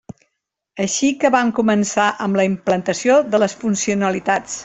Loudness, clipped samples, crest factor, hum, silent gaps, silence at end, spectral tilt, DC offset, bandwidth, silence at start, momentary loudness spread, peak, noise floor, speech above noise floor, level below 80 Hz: -18 LUFS; under 0.1%; 16 dB; none; none; 0 s; -4.5 dB/octave; under 0.1%; 8.4 kHz; 0.75 s; 5 LU; -2 dBFS; -76 dBFS; 59 dB; -58 dBFS